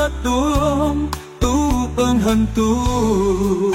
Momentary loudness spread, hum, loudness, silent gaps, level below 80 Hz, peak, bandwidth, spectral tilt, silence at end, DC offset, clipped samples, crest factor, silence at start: 3 LU; none; -18 LUFS; none; -26 dBFS; -6 dBFS; 16.5 kHz; -6 dB/octave; 0 s; under 0.1%; under 0.1%; 12 dB; 0 s